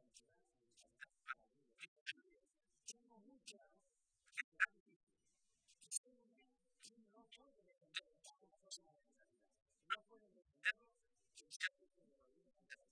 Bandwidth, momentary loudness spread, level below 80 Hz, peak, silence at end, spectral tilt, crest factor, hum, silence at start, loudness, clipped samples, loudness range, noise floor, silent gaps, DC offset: 10.5 kHz; 23 LU; under -90 dBFS; -22 dBFS; 0.15 s; 2 dB/octave; 32 dB; none; 0.15 s; -48 LUFS; under 0.1%; 9 LU; -86 dBFS; 1.88-2.06 s, 4.44-4.52 s, 4.80-4.86 s, 4.96-5.07 s, 5.98-6.04 s, 11.56-11.60 s; under 0.1%